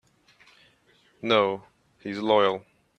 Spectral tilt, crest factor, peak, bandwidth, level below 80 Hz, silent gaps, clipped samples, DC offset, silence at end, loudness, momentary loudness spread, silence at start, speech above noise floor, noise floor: -5.5 dB/octave; 22 dB; -6 dBFS; 8.6 kHz; -72 dBFS; none; under 0.1%; under 0.1%; 0.4 s; -25 LUFS; 15 LU; 1.25 s; 39 dB; -63 dBFS